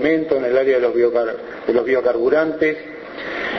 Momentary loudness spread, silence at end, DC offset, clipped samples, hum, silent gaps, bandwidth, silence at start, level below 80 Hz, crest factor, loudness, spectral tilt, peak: 11 LU; 0 s; under 0.1%; under 0.1%; none; none; 6.2 kHz; 0 s; -54 dBFS; 14 dB; -18 LUFS; -7 dB/octave; -4 dBFS